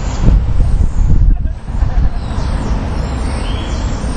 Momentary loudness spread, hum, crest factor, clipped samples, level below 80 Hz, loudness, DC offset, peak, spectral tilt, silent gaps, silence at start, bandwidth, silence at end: 6 LU; none; 12 dB; 0.3%; -14 dBFS; -17 LUFS; under 0.1%; 0 dBFS; -7 dB/octave; none; 0 s; 9.4 kHz; 0 s